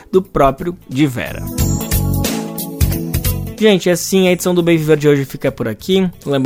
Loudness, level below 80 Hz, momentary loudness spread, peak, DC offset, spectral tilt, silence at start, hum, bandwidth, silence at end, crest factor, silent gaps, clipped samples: -16 LUFS; -28 dBFS; 9 LU; 0 dBFS; under 0.1%; -5.5 dB/octave; 0.1 s; none; 16.5 kHz; 0 s; 14 dB; none; under 0.1%